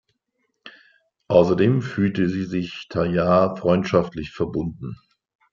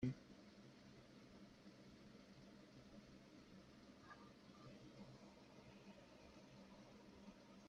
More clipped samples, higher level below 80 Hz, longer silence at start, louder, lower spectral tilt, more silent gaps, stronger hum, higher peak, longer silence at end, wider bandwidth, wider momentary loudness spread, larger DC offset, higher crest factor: neither; first, -52 dBFS vs -78 dBFS; first, 0.65 s vs 0 s; first, -21 LUFS vs -62 LUFS; first, -8 dB/octave vs -6.5 dB/octave; neither; neither; first, -2 dBFS vs -32 dBFS; first, 0.6 s vs 0 s; second, 7.2 kHz vs 10.5 kHz; first, 11 LU vs 3 LU; neither; second, 20 dB vs 26 dB